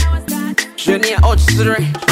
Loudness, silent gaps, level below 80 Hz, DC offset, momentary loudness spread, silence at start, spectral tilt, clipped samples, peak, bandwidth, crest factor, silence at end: -14 LUFS; none; -18 dBFS; under 0.1%; 6 LU; 0 s; -5 dB/octave; under 0.1%; -2 dBFS; 16.5 kHz; 12 dB; 0 s